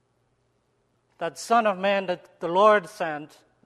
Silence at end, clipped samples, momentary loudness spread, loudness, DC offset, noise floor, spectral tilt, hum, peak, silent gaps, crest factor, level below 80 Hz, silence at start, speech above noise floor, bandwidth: 0.4 s; under 0.1%; 15 LU; -24 LUFS; under 0.1%; -70 dBFS; -4.5 dB/octave; none; -6 dBFS; none; 20 dB; -76 dBFS; 1.2 s; 46 dB; 13.5 kHz